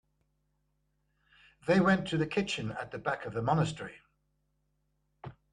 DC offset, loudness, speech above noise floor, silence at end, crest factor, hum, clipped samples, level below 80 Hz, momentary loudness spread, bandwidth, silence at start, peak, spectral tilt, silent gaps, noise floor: under 0.1%; -31 LUFS; 46 dB; 0.2 s; 20 dB; 50 Hz at -55 dBFS; under 0.1%; -62 dBFS; 20 LU; 10 kHz; 1.65 s; -14 dBFS; -6 dB/octave; none; -77 dBFS